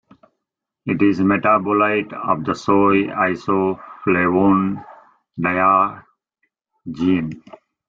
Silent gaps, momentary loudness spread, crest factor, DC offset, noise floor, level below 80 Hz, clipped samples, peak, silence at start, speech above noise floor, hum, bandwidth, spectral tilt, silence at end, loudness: none; 15 LU; 16 dB; under 0.1%; -81 dBFS; -56 dBFS; under 0.1%; -2 dBFS; 0.85 s; 63 dB; none; 7.4 kHz; -8 dB/octave; 0.5 s; -18 LUFS